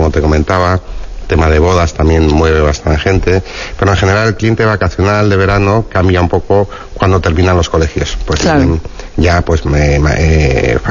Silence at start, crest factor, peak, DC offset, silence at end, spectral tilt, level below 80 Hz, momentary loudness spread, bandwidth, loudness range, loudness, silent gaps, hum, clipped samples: 0 s; 10 dB; 0 dBFS; under 0.1%; 0 s; -6.5 dB/octave; -18 dBFS; 6 LU; 7.4 kHz; 1 LU; -11 LUFS; none; none; 0.2%